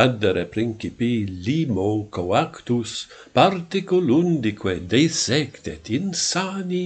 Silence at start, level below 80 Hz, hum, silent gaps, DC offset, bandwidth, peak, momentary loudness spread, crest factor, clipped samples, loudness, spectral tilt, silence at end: 0 s; -54 dBFS; none; none; under 0.1%; 9.2 kHz; 0 dBFS; 8 LU; 22 dB; under 0.1%; -22 LUFS; -5 dB/octave; 0 s